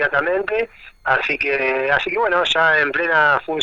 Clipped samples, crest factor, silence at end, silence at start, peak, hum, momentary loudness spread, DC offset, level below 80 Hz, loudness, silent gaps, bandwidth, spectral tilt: under 0.1%; 16 dB; 0 s; 0 s; -2 dBFS; none; 8 LU; under 0.1%; -50 dBFS; -17 LUFS; none; 8 kHz; -4 dB/octave